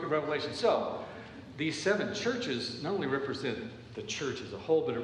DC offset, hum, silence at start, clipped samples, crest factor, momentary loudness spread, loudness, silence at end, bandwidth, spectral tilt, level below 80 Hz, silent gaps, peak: under 0.1%; none; 0 s; under 0.1%; 18 dB; 13 LU; -33 LUFS; 0 s; 10.5 kHz; -4.5 dB/octave; -66 dBFS; none; -14 dBFS